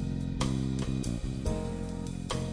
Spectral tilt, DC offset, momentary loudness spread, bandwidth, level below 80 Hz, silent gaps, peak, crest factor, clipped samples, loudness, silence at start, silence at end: -6 dB/octave; under 0.1%; 5 LU; 10.5 kHz; -40 dBFS; none; -16 dBFS; 16 dB; under 0.1%; -34 LUFS; 0 s; 0 s